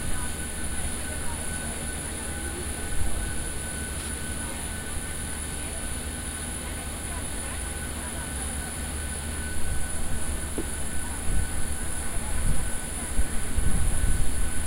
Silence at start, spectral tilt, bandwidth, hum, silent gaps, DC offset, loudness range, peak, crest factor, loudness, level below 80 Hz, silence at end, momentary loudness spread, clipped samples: 0 s; -3.5 dB/octave; 16 kHz; none; none; under 0.1%; 2 LU; -10 dBFS; 16 dB; -31 LUFS; -32 dBFS; 0 s; 3 LU; under 0.1%